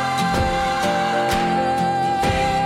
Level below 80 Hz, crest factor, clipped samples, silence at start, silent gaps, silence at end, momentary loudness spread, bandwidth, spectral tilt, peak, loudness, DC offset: -36 dBFS; 10 dB; under 0.1%; 0 s; none; 0 s; 1 LU; 16 kHz; -4.5 dB/octave; -10 dBFS; -20 LUFS; under 0.1%